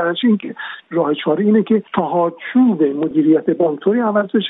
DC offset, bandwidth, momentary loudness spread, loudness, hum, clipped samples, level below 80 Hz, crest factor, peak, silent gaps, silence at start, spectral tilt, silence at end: under 0.1%; 4 kHz; 6 LU; -16 LUFS; none; under 0.1%; -66 dBFS; 14 dB; -2 dBFS; none; 0 s; -10.5 dB/octave; 0 s